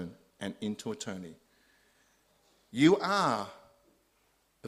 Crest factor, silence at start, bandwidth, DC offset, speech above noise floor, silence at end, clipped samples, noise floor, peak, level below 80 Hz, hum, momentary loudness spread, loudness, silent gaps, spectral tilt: 22 dB; 0 s; 13 kHz; under 0.1%; 42 dB; 0 s; under 0.1%; -72 dBFS; -12 dBFS; -72 dBFS; none; 20 LU; -30 LUFS; none; -5 dB/octave